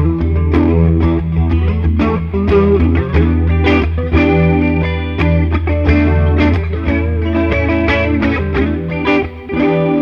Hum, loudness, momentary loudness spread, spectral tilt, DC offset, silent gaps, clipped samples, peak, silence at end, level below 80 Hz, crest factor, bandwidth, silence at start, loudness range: none; -14 LUFS; 5 LU; -9.5 dB/octave; under 0.1%; none; under 0.1%; 0 dBFS; 0 s; -20 dBFS; 12 dB; 5.8 kHz; 0 s; 2 LU